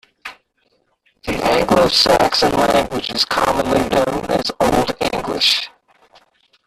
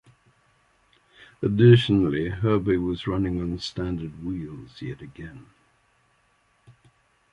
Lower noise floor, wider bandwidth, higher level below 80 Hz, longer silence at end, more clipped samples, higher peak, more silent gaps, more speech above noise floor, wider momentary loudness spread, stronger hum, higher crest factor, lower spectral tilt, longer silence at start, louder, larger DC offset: about the same, -63 dBFS vs -65 dBFS; first, 15 kHz vs 9.4 kHz; first, -40 dBFS vs -46 dBFS; second, 1 s vs 1.9 s; neither; about the same, -2 dBFS vs -4 dBFS; neither; first, 48 dB vs 42 dB; second, 13 LU vs 22 LU; neither; second, 16 dB vs 22 dB; second, -3.5 dB/octave vs -8 dB/octave; second, 0.25 s vs 1.4 s; first, -16 LUFS vs -23 LUFS; neither